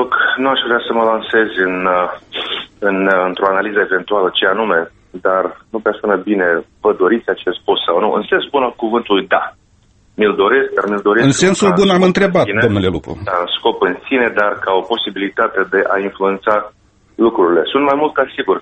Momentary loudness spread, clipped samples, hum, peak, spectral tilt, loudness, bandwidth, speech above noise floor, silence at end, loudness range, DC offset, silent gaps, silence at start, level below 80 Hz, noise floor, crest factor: 7 LU; under 0.1%; none; 0 dBFS; -5 dB/octave; -15 LUFS; 8.8 kHz; 37 dB; 0 s; 3 LU; under 0.1%; none; 0 s; -48 dBFS; -52 dBFS; 14 dB